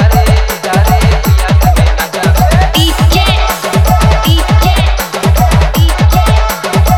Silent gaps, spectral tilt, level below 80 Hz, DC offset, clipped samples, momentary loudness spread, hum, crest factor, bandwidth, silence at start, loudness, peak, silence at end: none; -5 dB/octave; -12 dBFS; under 0.1%; 0.4%; 3 LU; none; 8 dB; 19.5 kHz; 0 s; -9 LUFS; 0 dBFS; 0 s